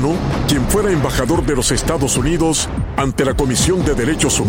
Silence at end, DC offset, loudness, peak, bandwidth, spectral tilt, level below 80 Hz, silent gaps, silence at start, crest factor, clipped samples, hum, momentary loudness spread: 0 s; under 0.1%; -16 LUFS; -2 dBFS; 16.5 kHz; -4.5 dB/octave; -26 dBFS; none; 0 s; 14 dB; under 0.1%; none; 3 LU